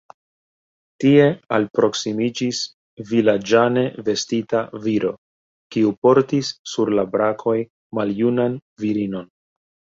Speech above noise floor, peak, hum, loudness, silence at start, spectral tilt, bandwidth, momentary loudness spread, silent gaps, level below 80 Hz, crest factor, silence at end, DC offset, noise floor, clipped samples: over 71 dB; -2 dBFS; none; -20 LUFS; 1 s; -5.5 dB/octave; 7.8 kHz; 11 LU; 1.70-1.74 s, 2.74-2.97 s, 5.18-5.70 s, 5.98-6.02 s, 6.59-6.65 s, 7.70-7.90 s, 8.62-8.76 s; -62 dBFS; 18 dB; 0.7 s; under 0.1%; under -90 dBFS; under 0.1%